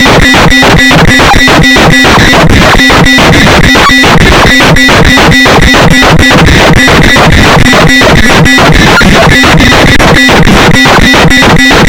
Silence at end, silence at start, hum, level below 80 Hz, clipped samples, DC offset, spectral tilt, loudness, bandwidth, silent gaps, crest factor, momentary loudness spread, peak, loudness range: 0 s; 0 s; none; -12 dBFS; 30%; 3%; -4.5 dB/octave; -1 LUFS; over 20 kHz; none; 2 dB; 1 LU; 0 dBFS; 0 LU